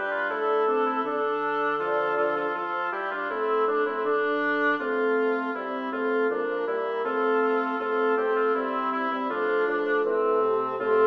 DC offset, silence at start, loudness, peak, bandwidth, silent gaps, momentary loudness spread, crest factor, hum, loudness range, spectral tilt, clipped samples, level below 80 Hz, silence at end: under 0.1%; 0 s; -26 LUFS; -12 dBFS; 5.6 kHz; none; 4 LU; 14 dB; none; 1 LU; -6 dB/octave; under 0.1%; -74 dBFS; 0 s